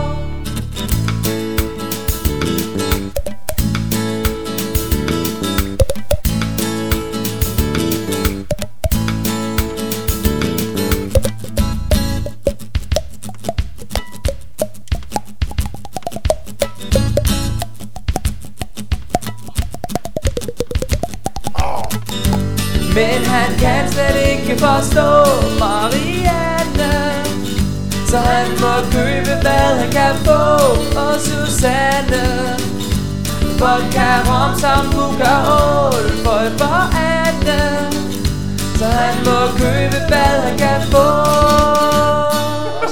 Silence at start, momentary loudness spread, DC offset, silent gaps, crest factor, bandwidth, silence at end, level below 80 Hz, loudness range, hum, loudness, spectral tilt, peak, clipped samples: 0 s; 12 LU; 5%; none; 16 dB; over 20 kHz; 0 s; -24 dBFS; 8 LU; none; -16 LUFS; -5 dB/octave; 0 dBFS; under 0.1%